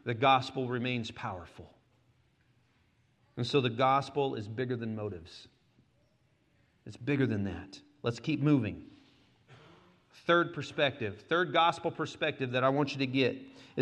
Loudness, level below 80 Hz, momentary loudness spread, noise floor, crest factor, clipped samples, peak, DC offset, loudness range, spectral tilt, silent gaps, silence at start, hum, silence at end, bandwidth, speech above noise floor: -31 LUFS; -70 dBFS; 18 LU; -70 dBFS; 20 dB; under 0.1%; -14 dBFS; under 0.1%; 7 LU; -6.5 dB/octave; none; 0.05 s; none; 0 s; 9.8 kHz; 39 dB